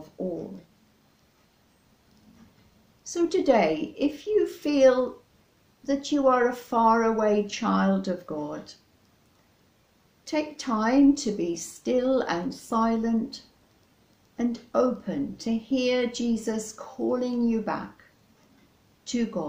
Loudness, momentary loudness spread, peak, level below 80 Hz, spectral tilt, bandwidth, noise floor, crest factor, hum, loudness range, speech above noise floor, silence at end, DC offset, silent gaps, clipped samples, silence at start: -26 LUFS; 14 LU; -8 dBFS; -58 dBFS; -5.5 dB/octave; 16 kHz; -63 dBFS; 20 dB; none; 6 LU; 38 dB; 0 s; under 0.1%; none; under 0.1%; 0 s